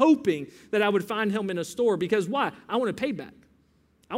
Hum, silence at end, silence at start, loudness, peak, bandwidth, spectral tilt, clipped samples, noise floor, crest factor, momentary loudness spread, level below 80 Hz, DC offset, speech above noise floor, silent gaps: none; 0 s; 0 s; -26 LUFS; -6 dBFS; 16 kHz; -5.5 dB/octave; under 0.1%; -64 dBFS; 20 dB; 7 LU; -68 dBFS; under 0.1%; 38 dB; none